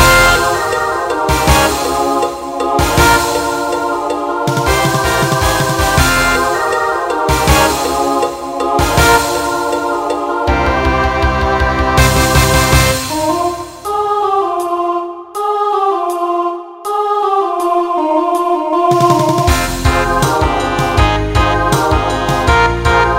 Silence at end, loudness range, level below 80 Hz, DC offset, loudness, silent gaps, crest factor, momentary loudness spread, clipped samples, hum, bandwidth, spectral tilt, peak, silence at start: 0 s; 3 LU; -22 dBFS; under 0.1%; -13 LUFS; none; 12 dB; 7 LU; under 0.1%; none; 16.5 kHz; -4.5 dB/octave; 0 dBFS; 0 s